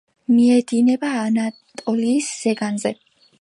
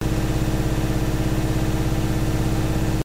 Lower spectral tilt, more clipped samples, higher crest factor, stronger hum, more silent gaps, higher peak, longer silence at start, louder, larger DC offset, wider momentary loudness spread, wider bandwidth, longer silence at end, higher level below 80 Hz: second, -5 dB/octave vs -6.5 dB/octave; neither; about the same, 14 dB vs 12 dB; second, none vs 50 Hz at -25 dBFS; neither; first, -6 dBFS vs -10 dBFS; first, 0.3 s vs 0 s; first, -19 LUFS vs -23 LUFS; neither; first, 12 LU vs 0 LU; second, 11.5 kHz vs 16 kHz; first, 0.5 s vs 0 s; second, -70 dBFS vs -26 dBFS